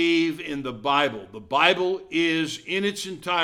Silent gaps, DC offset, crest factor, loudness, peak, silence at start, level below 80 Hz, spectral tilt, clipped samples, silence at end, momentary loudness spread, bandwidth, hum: none; under 0.1%; 22 dB; -24 LUFS; -2 dBFS; 0 s; -62 dBFS; -4 dB/octave; under 0.1%; 0 s; 11 LU; 14.5 kHz; none